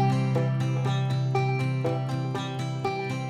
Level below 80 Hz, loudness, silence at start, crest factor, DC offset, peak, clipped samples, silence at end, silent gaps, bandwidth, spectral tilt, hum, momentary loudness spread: -62 dBFS; -27 LUFS; 0 s; 14 dB; under 0.1%; -12 dBFS; under 0.1%; 0 s; none; 9.6 kHz; -7 dB/octave; none; 5 LU